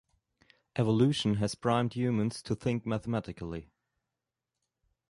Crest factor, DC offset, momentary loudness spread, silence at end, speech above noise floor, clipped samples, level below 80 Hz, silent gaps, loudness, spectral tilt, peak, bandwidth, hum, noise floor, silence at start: 20 dB; under 0.1%; 13 LU; 1.45 s; 59 dB; under 0.1%; -58 dBFS; none; -31 LUFS; -6.5 dB/octave; -12 dBFS; 11.5 kHz; none; -88 dBFS; 0.75 s